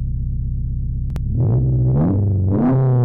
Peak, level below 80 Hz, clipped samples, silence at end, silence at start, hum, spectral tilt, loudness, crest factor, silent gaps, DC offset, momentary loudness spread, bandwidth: -12 dBFS; -26 dBFS; under 0.1%; 0 s; 0 s; none; -12.5 dB/octave; -19 LUFS; 6 dB; none; under 0.1%; 8 LU; 2.4 kHz